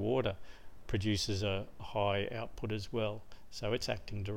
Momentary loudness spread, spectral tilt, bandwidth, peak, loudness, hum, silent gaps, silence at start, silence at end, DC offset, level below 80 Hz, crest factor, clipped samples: 10 LU; -5.5 dB/octave; 16.5 kHz; -18 dBFS; -37 LUFS; none; none; 0 s; 0 s; 0.4%; -52 dBFS; 18 dB; under 0.1%